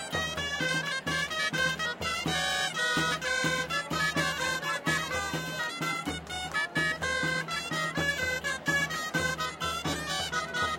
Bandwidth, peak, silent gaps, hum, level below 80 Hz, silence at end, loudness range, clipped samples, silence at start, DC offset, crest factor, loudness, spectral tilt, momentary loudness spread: 16.5 kHz; -12 dBFS; none; none; -56 dBFS; 0 s; 2 LU; under 0.1%; 0 s; under 0.1%; 18 dB; -29 LUFS; -2.5 dB/octave; 4 LU